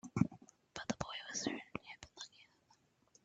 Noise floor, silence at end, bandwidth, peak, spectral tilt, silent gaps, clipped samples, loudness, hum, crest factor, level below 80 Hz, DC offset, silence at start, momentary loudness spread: -73 dBFS; 0.8 s; 9 kHz; -16 dBFS; -4.5 dB/octave; none; under 0.1%; -43 LUFS; none; 28 dB; -68 dBFS; under 0.1%; 0.05 s; 15 LU